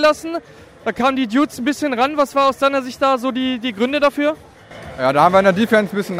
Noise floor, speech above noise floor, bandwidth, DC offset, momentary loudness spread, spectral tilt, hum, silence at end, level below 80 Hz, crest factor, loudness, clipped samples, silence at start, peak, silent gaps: -36 dBFS; 19 dB; 16 kHz; under 0.1%; 13 LU; -5 dB/octave; none; 0 s; -52 dBFS; 18 dB; -17 LUFS; under 0.1%; 0 s; 0 dBFS; none